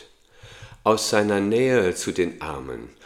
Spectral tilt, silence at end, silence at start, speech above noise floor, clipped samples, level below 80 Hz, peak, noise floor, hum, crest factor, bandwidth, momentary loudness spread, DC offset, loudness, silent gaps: -4.5 dB/octave; 0.15 s; 0.45 s; 27 dB; under 0.1%; -52 dBFS; -2 dBFS; -49 dBFS; none; 22 dB; 16 kHz; 13 LU; under 0.1%; -22 LUFS; none